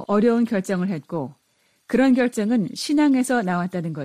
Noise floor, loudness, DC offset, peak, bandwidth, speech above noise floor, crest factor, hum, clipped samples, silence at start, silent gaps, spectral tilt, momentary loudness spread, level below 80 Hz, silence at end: -65 dBFS; -21 LUFS; under 0.1%; -8 dBFS; 14.5 kHz; 45 dB; 14 dB; none; under 0.1%; 0 s; none; -6 dB/octave; 10 LU; -60 dBFS; 0 s